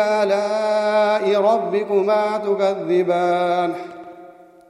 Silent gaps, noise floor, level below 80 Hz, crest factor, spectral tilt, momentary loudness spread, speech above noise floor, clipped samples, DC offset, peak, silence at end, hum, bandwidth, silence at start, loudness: none; -44 dBFS; -74 dBFS; 12 dB; -5.5 dB/octave; 5 LU; 25 dB; under 0.1%; under 0.1%; -6 dBFS; 0.4 s; none; 11.5 kHz; 0 s; -19 LUFS